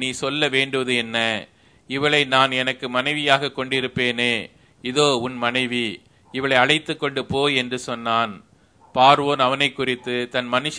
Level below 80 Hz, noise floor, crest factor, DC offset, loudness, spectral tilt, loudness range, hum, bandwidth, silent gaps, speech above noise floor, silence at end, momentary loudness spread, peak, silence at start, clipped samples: -60 dBFS; -54 dBFS; 22 dB; under 0.1%; -20 LUFS; -3.5 dB/octave; 2 LU; none; 11 kHz; none; 33 dB; 0 s; 10 LU; 0 dBFS; 0 s; under 0.1%